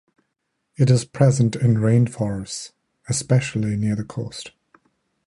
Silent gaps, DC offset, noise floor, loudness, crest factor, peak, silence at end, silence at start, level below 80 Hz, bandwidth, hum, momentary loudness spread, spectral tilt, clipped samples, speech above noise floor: none; under 0.1%; -75 dBFS; -21 LUFS; 20 dB; -2 dBFS; 0.8 s; 0.8 s; -52 dBFS; 11.5 kHz; none; 15 LU; -6.5 dB/octave; under 0.1%; 56 dB